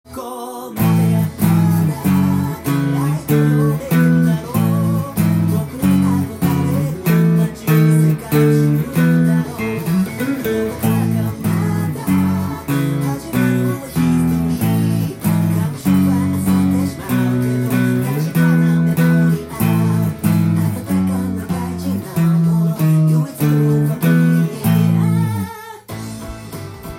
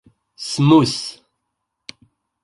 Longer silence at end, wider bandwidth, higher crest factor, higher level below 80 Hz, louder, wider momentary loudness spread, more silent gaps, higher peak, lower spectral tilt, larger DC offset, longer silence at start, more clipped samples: second, 0 s vs 1.3 s; first, 16.5 kHz vs 11.5 kHz; about the same, 14 dB vs 18 dB; first, -46 dBFS vs -56 dBFS; about the same, -16 LUFS vs -16 LUFS; second, 7 LU vs 26 LU; neither; about the same, -2 dBFS vs -2 dBFS; first, -7.5 dB/octave vs -6 dB/octave; neither; second, 0.1 s vs 0.4 s; neither